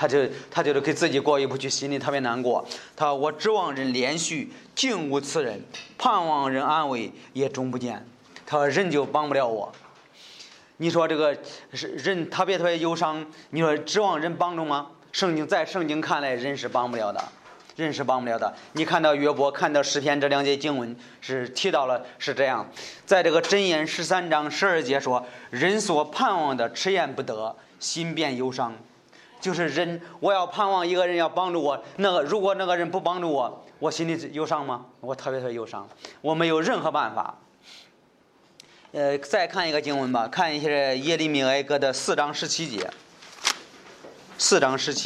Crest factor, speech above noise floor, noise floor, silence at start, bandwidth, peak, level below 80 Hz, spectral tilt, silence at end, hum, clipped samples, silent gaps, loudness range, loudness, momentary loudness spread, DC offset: 22 dB; 35 dB; -60 dBFS; 0 s; 13 kHz; -4 dBFS; -74 dBFS; -3.5 dB/octave; 0 s; none; under 0.1%; none; 4 LU; -25 LUFS; 10 LU; under 0.1%